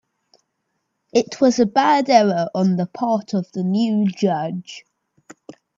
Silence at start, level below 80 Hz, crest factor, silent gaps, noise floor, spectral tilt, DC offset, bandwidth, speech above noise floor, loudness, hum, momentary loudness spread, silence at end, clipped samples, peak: 1.15 s; -66 dBFS; 20 dB; none; -74 dBFS; -6 dB/octave; under 0.1%; 7.6 kHz; 56 dB; -19 LUFS; none; 10 LU; 1 s; under 0.1%; 0 dBFS